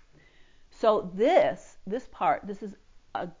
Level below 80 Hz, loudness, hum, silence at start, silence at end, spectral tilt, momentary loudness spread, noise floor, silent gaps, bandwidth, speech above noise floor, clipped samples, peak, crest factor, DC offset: -60 dBFS; -27 LUFS; none; 0.8 s; 0.1 s; -6 dB/octave; 17 LU; -56 dBFS; none; 7.6 kHz; 29 dB; under 0.1%; -8 dBFS; 20 dB; under 0.1%